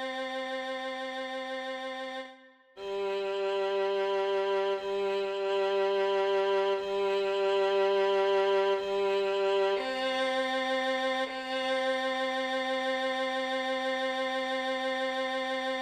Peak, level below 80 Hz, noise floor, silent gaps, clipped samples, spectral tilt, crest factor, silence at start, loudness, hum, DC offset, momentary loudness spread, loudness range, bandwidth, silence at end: -18 dBFS; -70 dBFS; -54 dBFS; none; under 0.1%; -3 dB/octave; 12 dB; 0 s; -30 LUFS; none; under 0.1%; 9 LU; 5 LU; 9.4 kHz; 0 s